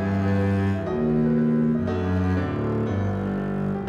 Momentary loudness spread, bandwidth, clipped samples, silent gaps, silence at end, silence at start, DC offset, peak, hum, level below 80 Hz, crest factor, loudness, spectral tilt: 5 LU; 7 kHz; under 0.1%; none; 0 s; 0 s; under 0.1%; -12 dBFS; none; -46 dBFS; 10 dB; -24 LUFS; -9.5 dB/octave